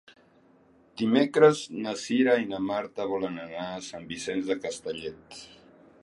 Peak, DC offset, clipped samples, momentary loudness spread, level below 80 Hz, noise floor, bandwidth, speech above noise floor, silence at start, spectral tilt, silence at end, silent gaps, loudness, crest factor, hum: -6 dBFS; under 0.1%; under 0.1%; 18 LU; -68 dBFS; -60 dBFS; 11.5 kHz; 33 dB; 0.95 s; -5 dB/octave; 0.55 s; none; -27 LUFS; 22 dB; none